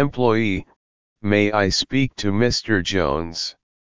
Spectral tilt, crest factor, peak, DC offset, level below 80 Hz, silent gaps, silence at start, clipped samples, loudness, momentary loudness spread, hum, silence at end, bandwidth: -5 dB/octave; 18 dB; -2 dBFS; 1%; -40 dBFS; 0.76-1.16 s; 0 s; under 0.1%; -21 LUFS; 10 LU; none; 0.25 s; 7.6 kHz